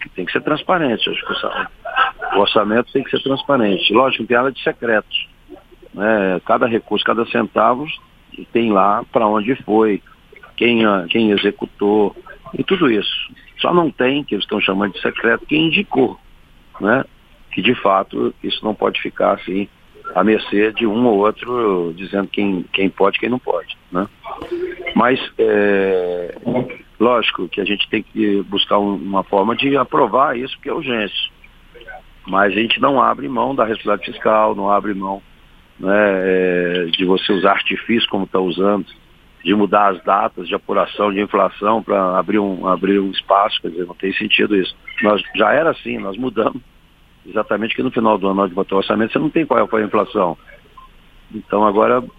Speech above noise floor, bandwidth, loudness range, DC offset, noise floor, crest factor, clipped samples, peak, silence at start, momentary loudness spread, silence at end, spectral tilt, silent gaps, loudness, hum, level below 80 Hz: 32 dB; 5 kHz; 2 LU; under 0.1%; -49 dBFS; 18 dB; under 0.1%; 0 dBFS; 0 s; 9 LU; 0.1 s; -7.5 dB/octave; none; -17 LUFS; none; -50 dBFS